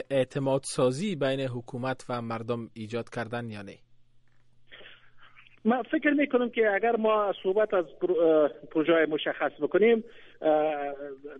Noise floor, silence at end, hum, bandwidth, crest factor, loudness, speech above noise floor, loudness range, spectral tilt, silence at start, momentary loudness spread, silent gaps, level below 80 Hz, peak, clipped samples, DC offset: -57 dBFS; 0 s; none; 11.5 kHz; 16 dB; -27 LUFS; 30 dB; 11 LU; -6 dB/octave; 0 s; 11 LU; none; -66 dBFS; -12 dBFS; under 0.1%; under 0.1%